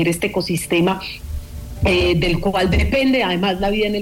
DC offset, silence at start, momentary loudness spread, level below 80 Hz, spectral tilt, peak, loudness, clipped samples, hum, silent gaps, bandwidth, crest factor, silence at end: under 0.1%; 0 s; 13 LU; -28 dBFS; -5.5 dB/octave; -6 dBFS; -18 LUFS; under 0.1%; none; none; 17 kHz; 12 dB; 0 s